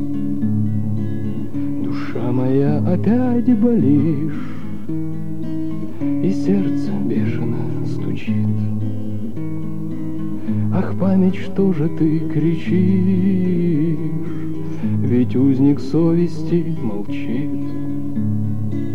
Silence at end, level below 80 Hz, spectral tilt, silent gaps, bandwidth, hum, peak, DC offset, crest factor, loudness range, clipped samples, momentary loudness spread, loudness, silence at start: 0 s; -54 dBFS; -10 dB/octave; none; 7.2 kHz; none; -4 dBFS; 8%; 14 dB; 4 LU; under 0.1%; 10 LU; -20 LUFS; 0 s